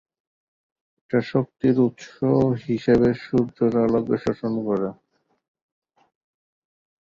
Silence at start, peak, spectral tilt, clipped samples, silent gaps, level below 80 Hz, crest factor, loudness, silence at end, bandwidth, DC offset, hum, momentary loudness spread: 1.1 s; -6 dBFS; -8.5 dB/octave; under 0.1%; none; -54 dBFS; 18 dB; -22 LUFS; 2.1 s; 7.2 kHz; under 0.1%; none; 6 LU